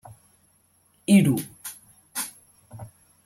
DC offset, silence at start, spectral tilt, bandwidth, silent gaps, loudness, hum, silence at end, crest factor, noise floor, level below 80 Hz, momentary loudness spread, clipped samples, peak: under 0.1%; 1.1 s; -5.5 dB/octave; 16.5 kHz; none; -23 LUFS; none; 0.4 s; 20 dB; -63 dBFS; -64 dBFS; 26 LU; under 0.1%; -6 dBFS